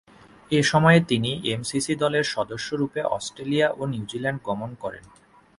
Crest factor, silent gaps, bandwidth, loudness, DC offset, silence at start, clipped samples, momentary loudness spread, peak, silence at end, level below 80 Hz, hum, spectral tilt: 20 dB; none; 11.5 kHz; -24 LUFS; under 0.1%; 0.5 s; under 0.1%; 13 LU; -4 dBFS; 0.6 s; -56 dBFS; none; -5 dB/octave